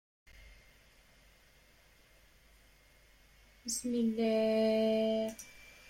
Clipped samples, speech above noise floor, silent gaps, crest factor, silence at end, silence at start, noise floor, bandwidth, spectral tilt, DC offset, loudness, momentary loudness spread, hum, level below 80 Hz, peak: under 0.1%; 33 dB; none; 16 dB; 0.2 s; 0.45 s; -64 dBFS; 16.5 kHz; -4.5 dB/octave; under 0.1%; -32 LUFS; 15 LU; none; -66 dBFS; -22 dBFS